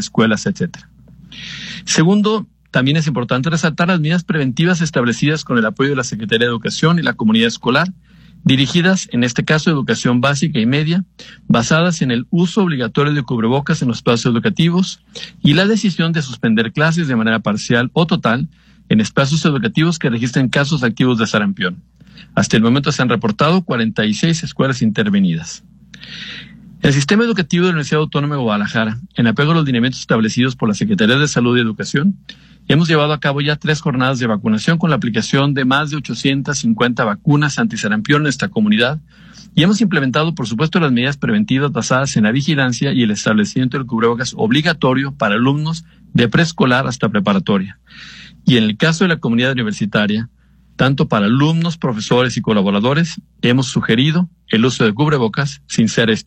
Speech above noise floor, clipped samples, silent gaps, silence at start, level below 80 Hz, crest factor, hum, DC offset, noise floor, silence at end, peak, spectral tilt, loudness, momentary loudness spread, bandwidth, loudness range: 22 dB; under 0.1%; none; 0 s; -48 dBFS; 14 dB; none; under 0.1%; -37 dBFS; 0.05 s; -2 dBFS; -5.5 dB/octave; -15 LUFS; 6 LU; 9.2 kHz; 1 LU